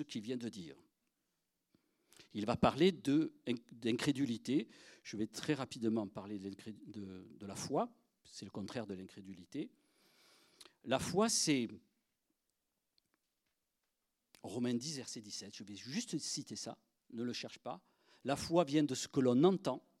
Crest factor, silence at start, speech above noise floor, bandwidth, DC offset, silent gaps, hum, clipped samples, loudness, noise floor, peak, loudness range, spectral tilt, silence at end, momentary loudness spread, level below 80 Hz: 24 dB; 0 s; 49 dB; 14.5 kHz; under 0.1%; none; none; under 0.1%; -38 LUFS; -87 dBFS; -14 dBFS; 9 LU; -4.5 dB/octave; 0.2 s; 18 LU; -72 dBFS